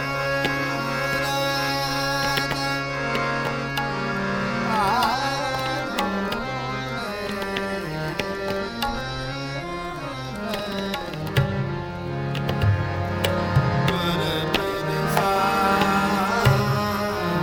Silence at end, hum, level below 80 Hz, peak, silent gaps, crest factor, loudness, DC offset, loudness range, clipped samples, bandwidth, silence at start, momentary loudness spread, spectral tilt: 0 s; none; -44 dBFS; -4 dBFS; none; 20 dB; -24 LUFS; under 0.1%; 6 LU; under 0.1%; 18 kHz; 0 s; 9 LU; -5 dB/octave